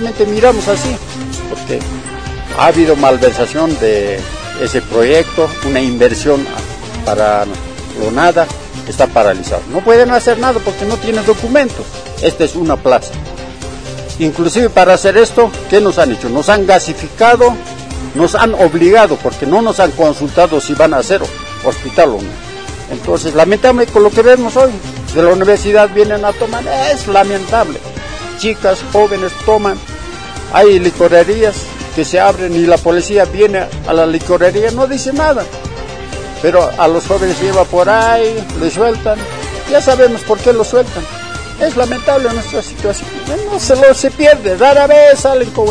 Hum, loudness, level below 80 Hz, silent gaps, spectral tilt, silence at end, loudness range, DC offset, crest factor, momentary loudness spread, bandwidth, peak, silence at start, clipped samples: none; -11 LUFS; -30 dBFS; none; -4.5 dB/octave; 0 s; 4 LU; 2%; 10 dB; 16 LU; 10.5 kHz; 0 dBFS; 0 s; 0.8%